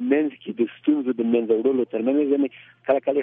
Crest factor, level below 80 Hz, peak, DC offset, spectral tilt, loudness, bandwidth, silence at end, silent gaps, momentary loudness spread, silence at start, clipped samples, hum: 16 dB; -76 dBFS; -6 dBFS; under 0.1%; -10 dB/octave; -23 LUFS; 3.7 kHz; 0 s; none; 6 LU; 0 s; under 0.1%; none